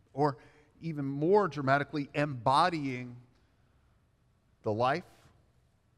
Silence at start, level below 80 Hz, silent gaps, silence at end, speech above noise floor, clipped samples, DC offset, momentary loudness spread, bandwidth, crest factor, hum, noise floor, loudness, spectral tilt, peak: 0.15 s; -68 dBFS; none; 0.95 s; 39 dB; under 0.1%; under 0.1%; 14 LU; 11 kHz; 20 dB; none; -69 dBFS; -31 LUFS; -6.5 dB/octave; -12 dBFS